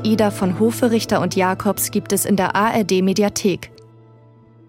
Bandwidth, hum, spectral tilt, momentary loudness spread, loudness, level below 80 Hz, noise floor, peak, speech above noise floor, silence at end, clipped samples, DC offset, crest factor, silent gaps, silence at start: 17 kHz; none; -5 dB/octave; 4 LU; -18 LUFS; -52 dBFS; -47 dBFS; -4 dBFS; 30 dB; 1 s; under 0.1%; under 0.1%; 14 dB; none; 0 s